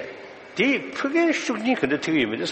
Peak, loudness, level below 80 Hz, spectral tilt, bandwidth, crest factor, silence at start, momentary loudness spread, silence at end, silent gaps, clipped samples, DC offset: -6 dBFS; -23 LUFS; -62 dBFS; -4.5 dB/octave; 8.6 kHz; 16 dB; 0 s; 12 LU; 0 s; none; under 0.1%; under 0.1%